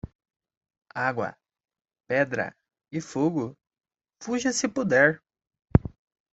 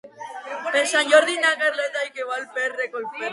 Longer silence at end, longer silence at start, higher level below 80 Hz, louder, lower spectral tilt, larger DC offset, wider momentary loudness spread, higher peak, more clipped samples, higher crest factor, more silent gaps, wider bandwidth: first, 0.45 s vs 0 s; about the same, 0.05 s vs 0.05 s; first, -46 dBFS vs -80 dBFS; second, -26 LUFS vs -21 LUFS; first, -5.5 dB/octave vs 0 dB/octave; neither; first, 18 LU vs 15 LU; about the same, -2 dBFS vs -2 dBFS; neither; first, 26 dB vs 20 dB; first, 0.15-0.19 s, 0.57-0.61 s vs none; second, 8.2 kHz vs 11.5 kHz